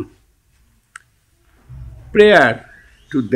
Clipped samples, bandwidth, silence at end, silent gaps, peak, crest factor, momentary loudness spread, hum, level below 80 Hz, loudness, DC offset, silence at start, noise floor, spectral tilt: under 0.1%; 10.5 kHz; 0 s; none; 0 dBFS; 18 dB; 27 LU; none; -44 dBFS; -13 LUFS; under 0.1%; 0 s; -57 dBFS; -5.5 dB/octave